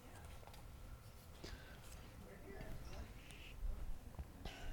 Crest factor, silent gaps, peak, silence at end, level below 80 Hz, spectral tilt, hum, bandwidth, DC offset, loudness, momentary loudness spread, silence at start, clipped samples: 16 dB; none; -34 dBFS; 0 s; -52 dBFS; -5 dB/octave; none; 19 kHz; under 0.1%; -55 LUFS; 6 LU; 0 s; under 0.1%